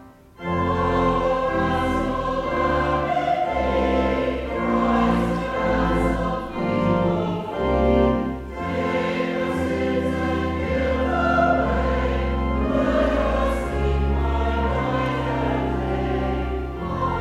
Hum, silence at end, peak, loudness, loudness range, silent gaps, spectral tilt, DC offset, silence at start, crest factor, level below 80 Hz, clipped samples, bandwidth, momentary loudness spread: none; 0 s; -6 dBFS; -22 LUFS; 2 LU; none; -7.5 dB/octave; under 0.1%; 0 s; 16 dB; -30 dBFS; under 0.1%; 11.5 kHz; 6 LU